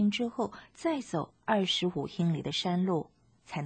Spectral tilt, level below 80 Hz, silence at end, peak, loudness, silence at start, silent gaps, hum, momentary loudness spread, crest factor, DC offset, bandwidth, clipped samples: -5.5 dB/octave; -66 dBFS; 0 s; -16 dBFS; -32 LUFS; 0 s; none; none; 8 LU; 16 dB; under 0.1%; 9.2 kHz; under 0.1%